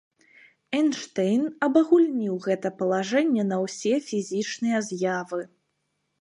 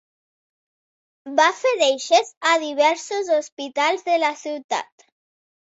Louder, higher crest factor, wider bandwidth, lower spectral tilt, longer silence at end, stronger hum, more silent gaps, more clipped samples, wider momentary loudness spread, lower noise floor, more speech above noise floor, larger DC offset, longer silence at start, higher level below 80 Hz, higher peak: second, -25 LUFS vs -20 LUFS; about the same, 18 dB vs 18 dB; first, 10.5 kHz vs 8 kHz; first, -5.5 dB/octave vs 0 dB/octave; about the same, 0.75 s vs 0.75 s; neither; second, none vs 2.37-2.41 s, 3.52-3.57 s, 4.64-4.69 s; neither; about the same, 9 LU vs 9 LU; second, -76 dBFS vs under -90 dBFS; second, 52 dB vs over 69 dB; neither; second, 0.7 s vs 1.25 s; about the same, -76 dBFS vs -76 dBFS; second, -8 dBFS vs -4 dBFS